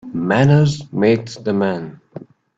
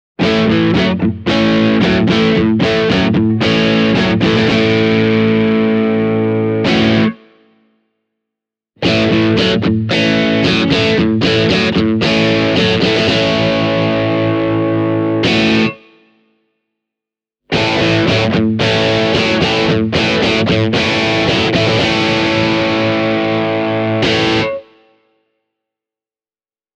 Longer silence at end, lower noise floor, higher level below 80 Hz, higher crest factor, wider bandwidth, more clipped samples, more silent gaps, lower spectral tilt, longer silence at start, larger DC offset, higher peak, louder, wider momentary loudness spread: second, 0.4 s vs 2.15 s; second, -38 dBFS vs under -90 dBFS; second, -52 dBFS vs -40 dBFS; about the same, 16 dB vs 14 dB; second, 7.8 kHz vs 8.8 kHz; neither; neither; first, -7.5 dB/octave vs -6 dB/octave; second, 0.05 s vs 0.2 s; neither; about the same, 0 dBFS vs 0 dBFS; second, -17 LUFS vs -13 LUFS; first, 15 LU vs 3 LU